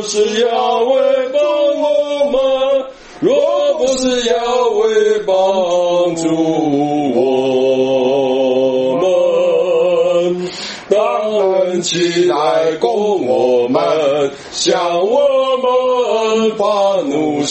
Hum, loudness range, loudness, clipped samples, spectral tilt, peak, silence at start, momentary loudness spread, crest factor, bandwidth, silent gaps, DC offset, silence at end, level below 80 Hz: none; 1 LU; -14 LUFS; under 0.1%; -4 dB/octave; 0 dBFS; 0 s; 3 LU; 14 dB; 8.6 kHz; none; under 0.1%; 0 s; -52 dBFS